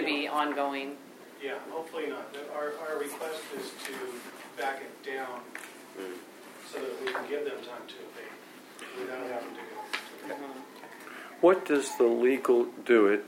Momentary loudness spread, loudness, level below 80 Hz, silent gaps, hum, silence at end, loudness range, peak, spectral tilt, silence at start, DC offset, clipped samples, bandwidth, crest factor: 20 LU; -31 LUFS; under -90 dBFS; none; none; 0 s; 11 LU; -10 dBFS; -3.5 dB/octave; 0 s; under 0.1%; under 0.1%; 16 kHz; 22 dB